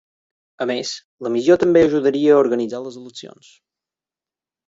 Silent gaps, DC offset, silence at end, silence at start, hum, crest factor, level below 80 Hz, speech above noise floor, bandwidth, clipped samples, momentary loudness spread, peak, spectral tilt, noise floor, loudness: 1.04-1.18 s; under 0.1%; 1.4 s; 0.6 s; none; 18 dB; -56 dBFS; over 72 dB; 7.8 kHz; under 0.1%; 19 LU; -2 dBFS; -5.5 dB/octave; under -90 dBFS; -17 LUFS